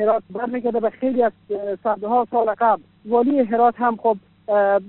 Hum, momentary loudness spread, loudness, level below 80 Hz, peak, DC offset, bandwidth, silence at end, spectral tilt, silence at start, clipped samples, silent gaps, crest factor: none; 7 LU; -21 LUFS; -66 dBFS; -6 dBFS; under 0.1%; 4.2 kHz; 0 s; -5.5 dB/octave; 0 s; under 0.1%; none; 14 dB